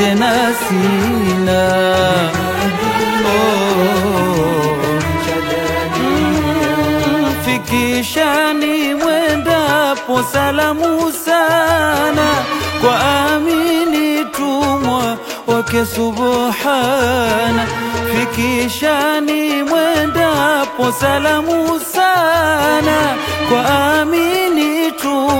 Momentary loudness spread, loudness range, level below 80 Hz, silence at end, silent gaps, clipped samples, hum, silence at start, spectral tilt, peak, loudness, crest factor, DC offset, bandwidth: 4 LU; 2 LU; -40 dBFS; 0 s; none; under 0.1%; none; 0 s; -4.5 dB/octave; 0 dBFS; -14 LUFS; 14 dB; under 0.1%; 16.5 kHz